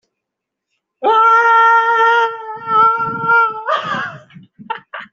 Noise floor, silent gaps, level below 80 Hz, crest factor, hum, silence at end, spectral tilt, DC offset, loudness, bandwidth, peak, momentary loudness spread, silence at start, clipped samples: -80 dBFS; none; -64 dBFS; 12 dB; none; 0.1 s; -4 dB/octave; under 0.1%; -13 LUFS; 7.2 kHz; -2 dBFS; 18 LU; 1 s; under 0.1%